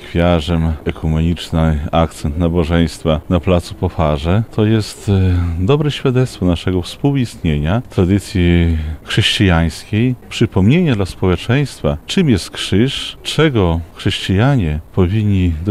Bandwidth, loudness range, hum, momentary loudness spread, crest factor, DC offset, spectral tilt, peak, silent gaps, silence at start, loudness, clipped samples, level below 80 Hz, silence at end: 13.5 kHz; 1 LU; none; 5 LU; 12 dB; under 0.1%; -6.5 dB/octave; -2 dBFS; none; 0 s; -16 LUFS; under 0.1%; -28 dBFS; 0 s